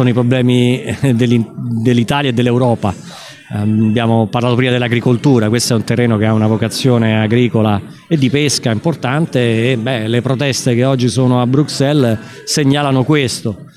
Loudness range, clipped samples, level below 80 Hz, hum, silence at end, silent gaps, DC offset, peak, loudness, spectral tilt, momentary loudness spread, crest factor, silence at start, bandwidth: 2 LU; under 0.1%; -48 dBFS; none; 0.1 s; none; under 0.1%; 0 dBFS; -14 LUFS; -6 dB/octave; 5 LU; 12 dB; 0 s; 14.5 kHz